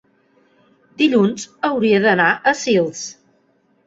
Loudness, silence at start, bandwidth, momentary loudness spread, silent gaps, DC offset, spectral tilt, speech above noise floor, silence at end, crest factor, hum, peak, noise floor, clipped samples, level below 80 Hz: -17 LUFS; 1 s; 8 kHz; 10 LU; none; under 0.1%; -4.5 dB/octave; 44 dB; 0.75 s; 18 dB; none; -2 dBFS; -60 dBFS; under 0.1%; -62 dBFS